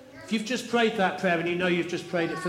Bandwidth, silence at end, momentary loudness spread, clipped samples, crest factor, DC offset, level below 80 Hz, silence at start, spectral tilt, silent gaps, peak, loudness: 15.5 kHz; 0 s; 5 LU; under 0.1%; 16 dB; under 0.1%; -68 dBFS; 0 s; -5 dB/octave; none; -10 dBFS; -27 LUFS